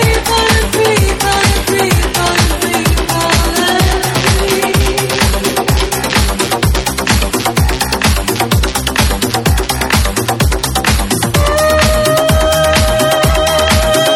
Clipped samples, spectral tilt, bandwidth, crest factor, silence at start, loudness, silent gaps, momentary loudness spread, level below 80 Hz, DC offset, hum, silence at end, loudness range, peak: under 0.1%; -4 dB/octave; 18 kHz; 12 dB; 0 s; -12 LUFS; none; 3 LU; -18 dBFS; under 0.1%; none; 0 s; 2 LU; 0 dBFS